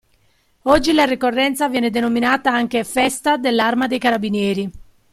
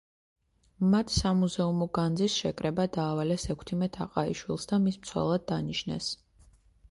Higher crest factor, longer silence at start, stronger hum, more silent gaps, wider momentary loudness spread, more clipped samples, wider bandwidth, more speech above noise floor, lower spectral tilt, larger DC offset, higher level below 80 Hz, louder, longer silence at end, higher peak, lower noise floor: about the same, 16 dB vs 18 dB; second, 0.65 s vs 0.8 s; neither; neither; second, 4 LU vs 7 LU; neither; first, 15.5 kHz vs 11.5 kHz; first, 42 dB vs 31 dB; second, -4 dB/octave vs -5.5 dB/octave; neither; about the same, -46 dBFS vs -50 dBFS; first, -17 LUFS vs -30 LUFS; second, 0.3 s vs 0.75 s; first, -2 dBFS vs -12 dBFS; about the same, -59 dBFS vs -60 dBFS